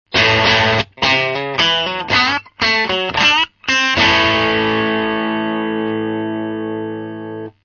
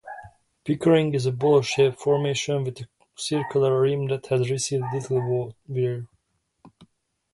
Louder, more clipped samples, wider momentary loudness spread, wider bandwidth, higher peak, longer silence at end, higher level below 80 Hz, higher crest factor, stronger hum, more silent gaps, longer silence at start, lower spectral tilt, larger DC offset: first, -15 LUFS vs -24 LUFS; neither; second, 12 LU vs 15 LU; second, 7.2 kHz vs 11.5 kHz; first, 0 dBFS vs -6 dBFS; second, 0.15 s vs 0.65 s; first, -44 dBFS vs -62 dBFS; about the same, 16 dB vs 18 dB; neither; neither; about the same, 0.1 s vs 0.05 s; second, -3.5 dB/octave vs -5.5 dB/octave; neither